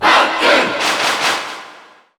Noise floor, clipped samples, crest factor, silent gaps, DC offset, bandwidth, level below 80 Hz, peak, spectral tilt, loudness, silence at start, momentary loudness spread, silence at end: -42 dBFS; under 0.1%; 14 dB; none; under 0.1%; over 20 kHz; -56 dBFS; 0 dBFS; -1 dB/octave; -14 LUFS; 0 s; 13 LU; 0.45 s